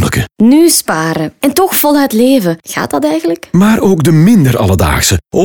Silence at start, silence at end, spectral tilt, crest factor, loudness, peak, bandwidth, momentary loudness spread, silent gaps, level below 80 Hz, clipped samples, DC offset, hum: 0 s; 0 s; -5 dB/octave; 10 dB; -9 LUFS; 0 dBFS; over 20 kHz; 7 LU; none; -32 dBFS; under 0.1%; under 0.1%; none